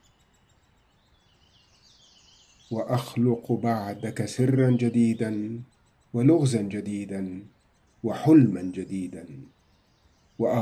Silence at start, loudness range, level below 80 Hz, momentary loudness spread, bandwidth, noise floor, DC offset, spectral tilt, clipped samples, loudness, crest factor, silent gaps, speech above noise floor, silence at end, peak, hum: 2.7 s; 6 LU; -68 dBFS; 16 LU; 14 kHz; -63 dBFS; under 0.1%; -7.5 dB/octave; under 0.1%; -25 LUFS; 20 dB; none; 39 dB; 0 s; -8 dBFS; none